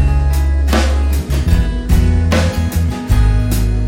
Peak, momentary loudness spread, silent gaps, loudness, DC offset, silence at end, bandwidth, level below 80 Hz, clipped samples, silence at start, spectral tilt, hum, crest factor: 0 dBFS; 3 LU; none; -15 LUFS; under 0.1%; 0 s; 17 kHz; -14 dBFS; under 0.1%; 0 s; -6 dB/octave; none; 12 dB